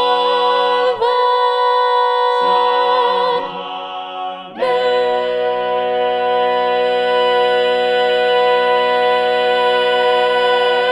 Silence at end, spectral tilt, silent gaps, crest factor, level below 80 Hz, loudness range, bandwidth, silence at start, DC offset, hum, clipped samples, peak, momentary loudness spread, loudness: 0 s; -3.5 dB/octave; none; 12 dB; -66 dBFS; 4 LU; 11 kHz; 0 s; under 0.1%; none; under 0.1%; -4 dBFS; 6 LU; -15 LUFS